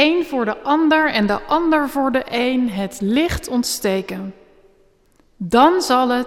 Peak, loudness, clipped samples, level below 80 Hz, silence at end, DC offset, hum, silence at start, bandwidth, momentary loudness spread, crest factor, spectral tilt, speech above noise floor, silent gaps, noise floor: -2 dBFS; -18 LUFS; under 0.1%; -42 dBFS; 0 s; under 0.1%; none; 0 s; 16.5 kHz; 9 LU; 16 dB; -4.5 dB/octave; 38 dB; none; -56 dBFS